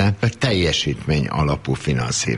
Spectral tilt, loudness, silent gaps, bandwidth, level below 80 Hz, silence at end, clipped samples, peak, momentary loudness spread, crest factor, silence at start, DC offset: -4.5 dB/octave; -20 LUFS; none; 11.5 kHz; -36 dBFS; 0 s; under 0.1%; -6 dBFS; 4 LU; 14 dB; 0 s; under 0.1%